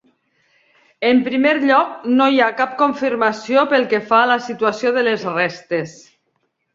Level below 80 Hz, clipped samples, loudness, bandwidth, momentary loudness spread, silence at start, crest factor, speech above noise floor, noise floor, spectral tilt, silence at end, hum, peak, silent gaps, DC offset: -66 dBFS; under 0.1%; -17 LUFS; 7.6 kHz; 6 LU; 1 s; 16 dB; 52 dB; -69 dBFS; -5 dB/octave; 0.8 s; none; -2 dBFS; none; under 0.1%